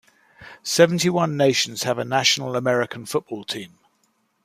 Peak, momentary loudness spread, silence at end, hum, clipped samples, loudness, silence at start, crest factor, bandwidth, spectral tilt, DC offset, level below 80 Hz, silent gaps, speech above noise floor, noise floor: -2 dBFS; 13 LU; 0.75 s; none; under 0.1%; -21 LUFS; 0.4 s; 22 dB; 15.5 kHz; -3.5 dB/octave; under 0.1%; -66 dBFS; none; 46 dB; -67 dBFS